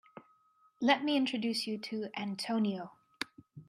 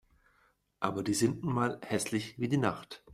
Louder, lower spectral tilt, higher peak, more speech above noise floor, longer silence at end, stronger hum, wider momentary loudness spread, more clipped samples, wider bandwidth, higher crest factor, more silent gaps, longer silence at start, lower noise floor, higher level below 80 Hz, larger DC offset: about the same, -34 LUFS vs -32 LUFS; about the same, -4.5 dB/octave vs -5 dB/octave; about the same, -12 dBFS vs -14 dBFS; about the same, 36 dB vs 39 dB; about the same, 0.05 s vs 0 s; neither; first, 14 LU vs 5 LU; neither; about the same, 14.5 kHz vs 15.5 kHz; about the same, 22 dB vs 20 dB; neither; second, 0.15 s vs 0.8 s; about the same, -69 dBFS vs -71 dBFS; second, -82 dBFS vs -64 dBFS; neither